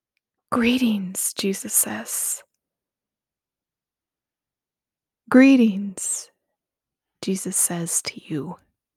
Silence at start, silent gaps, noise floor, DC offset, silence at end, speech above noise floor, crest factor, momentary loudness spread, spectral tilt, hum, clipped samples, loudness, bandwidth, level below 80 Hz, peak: 0.5 s; none; under -90 dBFS; under 0.1%; 0.4 s; over 69 dB; 22 dB; 16 LU; -3.5 dB/octave; none; under 0.1%; -21 LUFS; 16.5 kHz; -64 dBFS; -2 dBFS